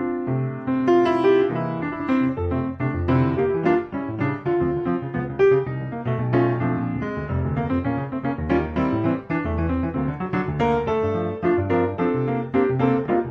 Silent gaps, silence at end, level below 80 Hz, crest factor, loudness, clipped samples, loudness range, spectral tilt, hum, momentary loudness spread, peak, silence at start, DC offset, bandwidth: none; 0 s; -42 dBFS; 14 dB; -22 LUFS; under 0.1%; 3 LU; -9.5 dB/octave; none; 8 LU; -6 dBFS; 0 s; under 0.1%; 6.2 kHz